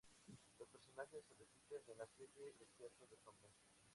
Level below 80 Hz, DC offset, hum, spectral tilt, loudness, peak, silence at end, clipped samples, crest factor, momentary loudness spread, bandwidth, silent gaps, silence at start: -88 dBFS; under 0.1%; none; -3.5 dB/octave; -61 LUFS; -38 dBFS; 0 s; under 0.1%; 22 dB; 11 LU; 11.5 kHz; none; 0.05 s